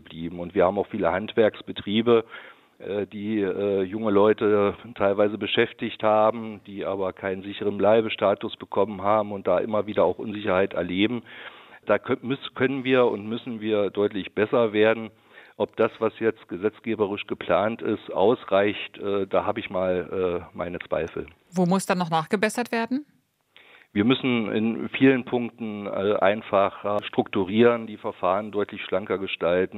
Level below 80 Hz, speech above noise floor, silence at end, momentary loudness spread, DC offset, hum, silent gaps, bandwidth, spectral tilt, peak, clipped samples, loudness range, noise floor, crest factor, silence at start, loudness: -66 dBFS; 34 dB; 0 s; 10 LU; under 0.1%; none; none; 14.5 kHz; -6 dB/octave; -4 dBFS; under 0.1%; 3 LU; -58 dBFS; 20 dB; 0.1 s; -24 LUFS